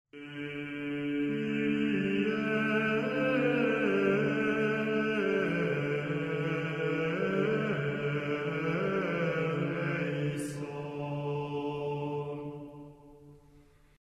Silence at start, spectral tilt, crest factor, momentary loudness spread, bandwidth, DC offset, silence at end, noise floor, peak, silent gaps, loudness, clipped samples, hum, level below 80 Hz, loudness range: 0.15 s; -7 dB/octave; 16 dB; 10 LU; 12.5 kHz; under 0.1%; 0.45 s; -60 dBFS; -16 dBFS; none; -31 LUFS; under 0.1%; none; -64 dBFS; 7 LU